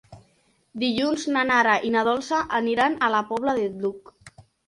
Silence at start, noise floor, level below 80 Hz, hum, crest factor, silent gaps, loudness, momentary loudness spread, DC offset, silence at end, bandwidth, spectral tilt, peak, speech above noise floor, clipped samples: 0.1 s; -64 dBFS; -62 dBFS; none; 18 dB; none; -23 LUFS; 10 LU; under 0.1%; 0.25 s; 11.5 kHz; -4 dB/octave; -6 dBFS; 41 dB; under 0.1%